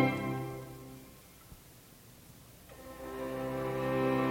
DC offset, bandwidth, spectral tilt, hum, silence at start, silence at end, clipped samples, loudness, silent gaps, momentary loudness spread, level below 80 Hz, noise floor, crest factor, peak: under 0.1%; 17 kHz; -6.5 dB/octave; none; 0 s; 0 s; under 0.1%; -36 LUFS; none; 24 LU; -60 dBFS; -56 dBFS; 22 dB; -16 dBFS